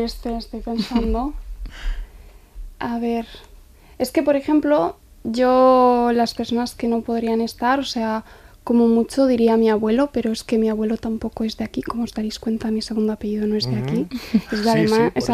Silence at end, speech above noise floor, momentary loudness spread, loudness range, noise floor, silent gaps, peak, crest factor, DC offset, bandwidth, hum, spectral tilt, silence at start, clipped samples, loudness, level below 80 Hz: 0 s; 26 dB; 12 LU; 8 LU; -46 dBFS; none; -4 dBFS; 16 dB; under 0.1%; 14.5 kHz; none; -6 dB/octave; 0 s; under 0.1%; -20 LUFS; -38 dBFS